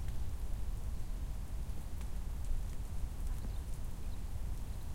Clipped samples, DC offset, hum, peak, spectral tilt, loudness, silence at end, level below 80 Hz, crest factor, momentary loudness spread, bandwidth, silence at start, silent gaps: under 0.1%; under 0.1%; none; -24 dBFS; -6 dB/octave; -45 LUFS; 0 s; -40 dBFS; 12 dB; 2 LU; 16.5 kHz; 0 s; none